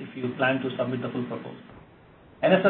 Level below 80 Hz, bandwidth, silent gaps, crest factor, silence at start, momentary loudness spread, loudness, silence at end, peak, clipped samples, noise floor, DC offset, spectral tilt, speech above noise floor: -64 dBFS; 4.3 kHz; none; 20 dB; 0 s; 18 LU; -28 LUFS; 0 s; -6 dBFS; under 0.1%; -53 dBFS; under 0.1%; -10.5 dB/octave; 27 dB